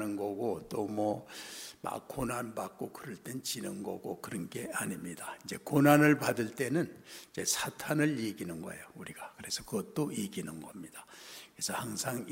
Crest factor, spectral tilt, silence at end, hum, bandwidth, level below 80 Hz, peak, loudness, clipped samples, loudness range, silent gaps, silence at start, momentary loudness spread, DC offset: 26 dB; -4.5 dB/octave; 0 s; none; 16 kHz; -66 dBFS; -8 dBFS; -34 LUFS; under 0.1%; 10 LU; none; 0 s; 16 LU; under 0.1%